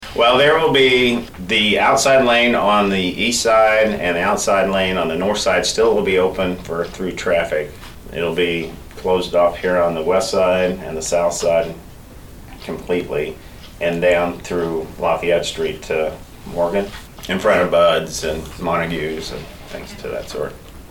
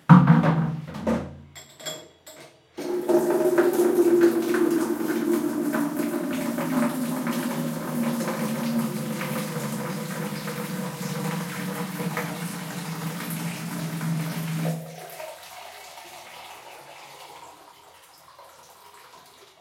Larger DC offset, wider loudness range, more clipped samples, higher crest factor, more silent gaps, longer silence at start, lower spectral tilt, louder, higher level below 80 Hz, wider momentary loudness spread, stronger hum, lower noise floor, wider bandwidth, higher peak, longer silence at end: neither; second, 7 LU vs 19 LU; neither; second, 14 dB vs 26 dB; neither; about the same, 0 s vs 0.1 s; second, -3.5 dB/octave vs -6.5 dB/octave; first, -17 LUFS vs -25 LUFS; first, -40 dBFS vs -64 dBFS; second, 15 LU vs 21 LU; neither; second, -38 dBFS vs -51 dBFS; first, 19 kHz vs 17 kHz; second, -4 dBFS vs 0 dBFS; second, 0.05 s vs 0.4 s